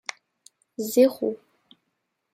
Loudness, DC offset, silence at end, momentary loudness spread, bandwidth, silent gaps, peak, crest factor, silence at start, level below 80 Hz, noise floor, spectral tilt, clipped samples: -23 LUFS; under 0.1%; 0.95 s; 21 LU; 16 kHz; none; -8 dBFS; 20 dB; 0.8 s; -78 dBFS; -78 dBFS; -4 dB/octave; under 0.1%